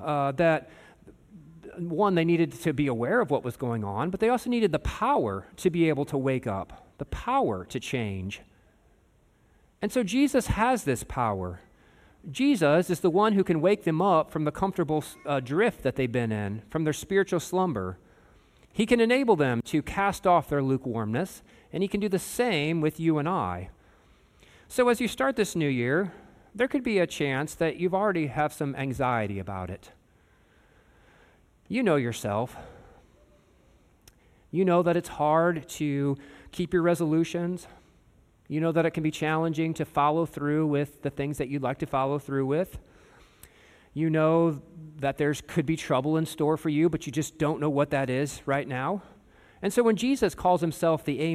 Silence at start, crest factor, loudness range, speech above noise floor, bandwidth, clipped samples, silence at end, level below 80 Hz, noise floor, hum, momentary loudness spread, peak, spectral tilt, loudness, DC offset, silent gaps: 0 s; 18 dB; 6 LU; 36 dB; 15.5 kHz; under 0.1%; 0 s; -52 dBFS; -63 dBFS; none; 11 LU; -8 dBFS; -6 dB/octave; -27 LUFS; under 0.1%; none